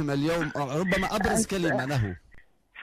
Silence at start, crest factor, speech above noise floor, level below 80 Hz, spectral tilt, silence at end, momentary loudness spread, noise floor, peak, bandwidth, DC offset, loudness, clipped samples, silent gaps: 0 s; 14 dB; 27 dB; -46 dBFS; -5 dB/octave; 0 s; 5 LU; -53 dBFS; -12 dBFS; 15.5 kHz; under 0.1%; -27 LUFS; under 0.1%; none